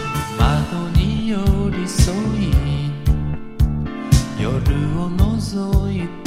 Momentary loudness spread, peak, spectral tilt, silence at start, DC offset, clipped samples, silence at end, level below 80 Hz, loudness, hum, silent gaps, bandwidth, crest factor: 4 LU; 0 dBFS; -6.5 dB/octave; 0 s; under 0.1%; under 0.1%; 0 s; -22 dBFS; -20 LUFS; none; none; 15.5 kHz; 16 dB